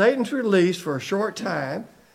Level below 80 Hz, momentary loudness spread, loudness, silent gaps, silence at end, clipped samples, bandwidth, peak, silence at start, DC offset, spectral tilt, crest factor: -70 dBFS; 9 LU; -23 LUFS; none; 0.3 s; under 0.1%; 15.5 kHz; -6 dBFS; 0 s; under 0.1%; -5.5 dB/octave; 18 dB